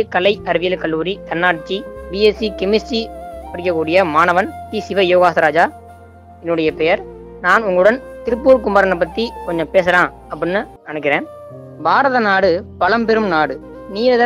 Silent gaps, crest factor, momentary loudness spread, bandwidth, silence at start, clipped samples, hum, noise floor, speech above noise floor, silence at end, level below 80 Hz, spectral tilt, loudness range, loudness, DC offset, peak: none; 16 dB; 12 LU; 12 kHz; 0 s; under 0.1%; none; -40 dBFS; 25 dB; 0 s; -42 dBFS; -5.5 dB/octave; 3 LU; -16 LUFS; under 0.1%; 0 dBFS